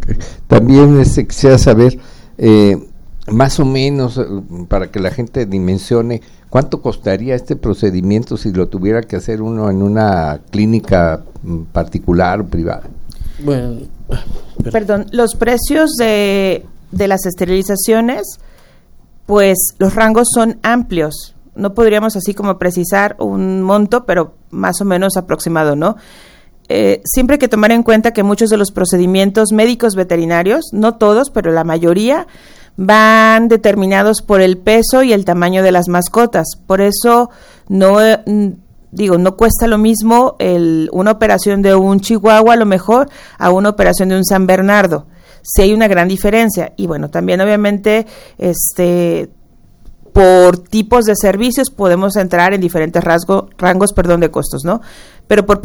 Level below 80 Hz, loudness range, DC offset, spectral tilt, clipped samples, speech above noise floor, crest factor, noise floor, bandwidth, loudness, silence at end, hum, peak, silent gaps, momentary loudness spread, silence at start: -28 dBFS; 6 LU; under 0.1%; -5.5 dB/octave; 0.4%; 30 dB; 12 dB; -41 dBFS; over 20 kHz; -12 LUFS; 0 s; none; 0 dBFS; none; 11 LU; 0 s